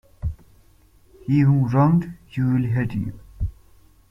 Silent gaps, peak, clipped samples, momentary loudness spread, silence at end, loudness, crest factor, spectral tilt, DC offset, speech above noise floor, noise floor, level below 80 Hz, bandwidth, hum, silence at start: none; -4 dBFS; under 0.1%; 15 LU; 0.6 s; -22 LUFS; 18 dB; -10 dB/octave; under 0.1%; 35 dB; -54 dBFS; -40 dBFS; 5.8 kHz; none; 0.25 s